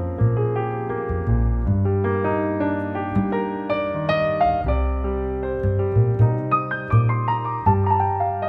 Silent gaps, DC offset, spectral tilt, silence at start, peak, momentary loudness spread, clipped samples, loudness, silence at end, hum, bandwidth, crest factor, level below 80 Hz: none; under 0.1%; -10.5 dB/octave; 0 s; -4 dBFS; 6 LU; under 0.1%; -22 LUFS; 0 s; none; 5.2 kHz; 16 dB; -30 dBFS